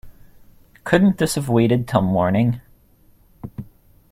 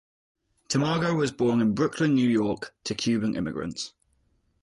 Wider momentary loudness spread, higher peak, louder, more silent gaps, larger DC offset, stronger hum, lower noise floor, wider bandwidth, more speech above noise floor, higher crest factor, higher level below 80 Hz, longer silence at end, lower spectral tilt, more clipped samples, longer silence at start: first, 19 LU vs 10 LU; first, -2 dBFS vs -12 dBFS; first, -18 LUFS vs -26 LUFS; neither; neither; neither; second, -53 dBFS vs -69 dBFS; first, 16 kHz vs 11.5 kHz; second, 36 dB vs 43 dB; first, 20 dB vs 14 dB; first, -48 dBFS vs -58 dBFS; second, 0.5 s vs 0.75 s; about the same, -6.5 dB/octave vs -5.5 dB/octave; neither; second, 0.05 s vs 0.7 s